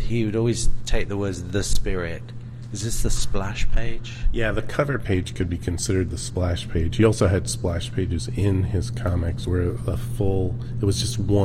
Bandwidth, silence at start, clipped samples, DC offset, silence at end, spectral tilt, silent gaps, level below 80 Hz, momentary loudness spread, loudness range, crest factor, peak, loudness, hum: 13.5 kHz; 0 s; under 0.1%; 0.6%; 0 s; -5.5 dB/octave; none; -28 dBFS; 7 LU; 4 LU; 16 dB; -6 dBFS; -25 LUFS; none